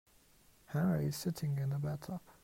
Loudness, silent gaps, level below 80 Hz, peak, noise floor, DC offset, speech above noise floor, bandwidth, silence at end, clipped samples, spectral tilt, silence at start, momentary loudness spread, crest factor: -37 LUFS; none; -66 dBFS; -22 dBFS; -66 dBFS; under 0.1%; 30 dB; 16 kHz; 0.1 s; under 0.1%; -7 dB/octave; 0.7 s; 9 LU; 16 dB